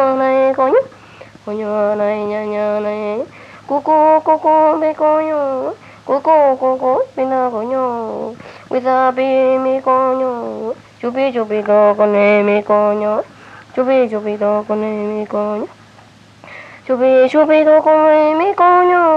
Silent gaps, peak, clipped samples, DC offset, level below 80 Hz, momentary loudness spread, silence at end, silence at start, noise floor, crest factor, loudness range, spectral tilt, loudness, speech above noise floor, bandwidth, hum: none; 0 dBFS; under 0.1%; under 0.1%; -62 dBFS; 14 LU; 0 s; 0 s; -43 dBFS; 14 dB; 5 LU; -7 dB/octave; -14 LUFS; 30 dB; 7.6 kHz; none